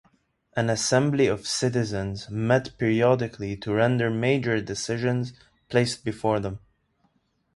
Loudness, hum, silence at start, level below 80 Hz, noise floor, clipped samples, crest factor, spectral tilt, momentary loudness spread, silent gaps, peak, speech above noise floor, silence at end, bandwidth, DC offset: -25 LUFS; none; 0.55 s; -54 dBFS; -69 dBFS; under 0.1%; 18 dB; -5.5 dB/octave; 9 LU; none; -6 dBFS; 44 dB; 0.95 s; 11.5 kHz; under 0.1%